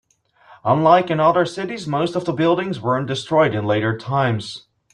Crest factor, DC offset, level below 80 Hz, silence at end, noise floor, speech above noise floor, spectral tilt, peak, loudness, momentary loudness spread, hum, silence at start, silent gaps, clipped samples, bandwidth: 18 dB; under 0.1%; -58 dBFS; 0.35 s; -52 dBFS; 33 dB; -6.5 dB/octave; -2 dBFS; -19 LUFS; 11 LU; none; 0.5 s; none; under 0.1%; 10.5 kHz